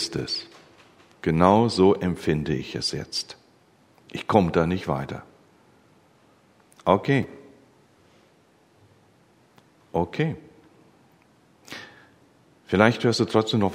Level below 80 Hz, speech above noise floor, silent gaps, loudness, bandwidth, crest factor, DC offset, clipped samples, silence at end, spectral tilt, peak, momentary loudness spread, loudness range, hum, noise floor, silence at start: -52 dBFS; 37 dB; none; -23 LUFS; 15 kHz; 26 dB; under 0.1%; under 0.1%; 0 s; -6 dB/octave; 0 dBFS; 20 LU; 10 LU; none; -59 dBFS; 0 s